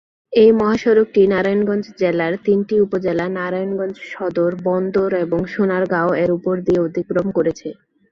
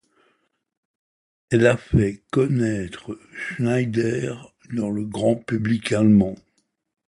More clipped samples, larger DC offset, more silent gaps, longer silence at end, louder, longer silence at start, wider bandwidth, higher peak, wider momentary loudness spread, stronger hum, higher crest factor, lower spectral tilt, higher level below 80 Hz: neither; neither; neither; second, 0.4 s vs 0.75 s; first, -18 LUFS vs -22 LUFS; second, 0.3 s vs 1.5 s; second, 7 kHz vs 11.5 kHz; about the same, -2 dBFS vs -2 dBFS; second, 8 LU vs 14 LU; neither; about the same, 16 dB vs 20 dB; about the same, -7.5 dB/octave vs -7 dB/octave; second, -52 dBFS vs -44 dBFS